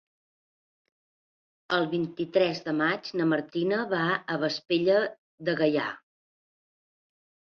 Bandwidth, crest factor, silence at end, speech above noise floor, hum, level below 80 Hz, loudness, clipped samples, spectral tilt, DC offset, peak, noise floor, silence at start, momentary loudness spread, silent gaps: 6.8 kHz; 18 dB; 1.6 s; over 63 dB; none; -74 dBFS; -27 LUFS; under 0.1%; -6.5 dB/octave; under 0.1%; -10 dBFS; under -90 dBFS; 1.7 s; 6 LU; 5.18-5.38 s